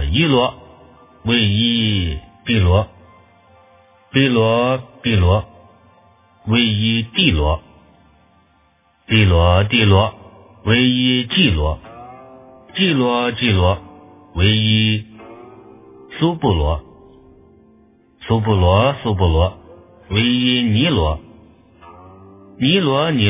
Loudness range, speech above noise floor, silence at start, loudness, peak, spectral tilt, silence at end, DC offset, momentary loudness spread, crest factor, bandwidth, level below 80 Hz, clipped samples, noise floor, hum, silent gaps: 4 LU; 42 dB; 0 s; -16 LUFS; 0 dBFS; -10.5 dB/octave; 0 s; under 0.1%; 12 LU; 18 dB; 3.9 kHz; -28 dBFS; under 0.1%; -57 dBFS; none; none